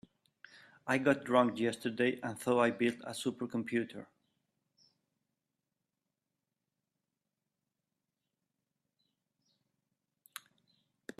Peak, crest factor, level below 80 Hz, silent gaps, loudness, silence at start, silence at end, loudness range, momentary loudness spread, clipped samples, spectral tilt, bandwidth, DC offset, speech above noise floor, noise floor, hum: -14 dBFS; 24 dB; -80 dBFS; none; -33 LUFS; 0.85 s; 7.15 s; 11 LU; 22 LU; under 0.1%; -5 dB/octave; 13.5 kHz; under 0.1%; 56 dB; -89 dBFS; none